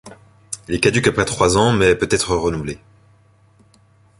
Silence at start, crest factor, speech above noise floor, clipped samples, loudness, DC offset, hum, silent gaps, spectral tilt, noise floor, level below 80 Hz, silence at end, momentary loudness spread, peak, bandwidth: 0.05 s; 20 dB; 37 dB; under 0.1%; -17 LUFS; under 0.1%; none; none; -4.5 dB/octave; -53 dBFS; -40 dBFS; 1.45 s; 16 LU; 0 dBFS; 11.5 kHz